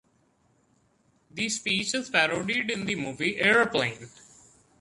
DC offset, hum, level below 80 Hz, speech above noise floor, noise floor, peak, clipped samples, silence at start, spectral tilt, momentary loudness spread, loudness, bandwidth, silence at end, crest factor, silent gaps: under 0.1%; none; -64 dBFS; 40 dB; -67 dBFS; -6 dBFS; under 0.1%; 1.35 s; -3 dB/octave; 10 LU; -25 LUFS; 11.5 kHz; 0.75 s; 24 dB; none